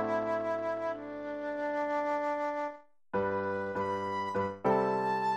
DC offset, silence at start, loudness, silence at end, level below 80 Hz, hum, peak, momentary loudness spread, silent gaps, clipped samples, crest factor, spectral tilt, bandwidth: under 0.1%; 0 s; -33 LUFS; 0 s; -68 dBFS; none; -16 dBFS; 8 LU; none; under 0.1%; 18 dB; -7 dB/octave; 12.5 kHz